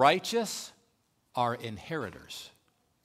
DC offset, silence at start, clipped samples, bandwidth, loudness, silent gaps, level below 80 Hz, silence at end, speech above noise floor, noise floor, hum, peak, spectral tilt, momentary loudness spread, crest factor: under 0.1%; 0 s; under 0.1%; 16 kHz; -32 LUFS; none; -68 dBFS; 0.55 s; 42 dB; -73 dBFS; none; -8 dBFS; -3.5 dB/octave; 15 LU; 24 dB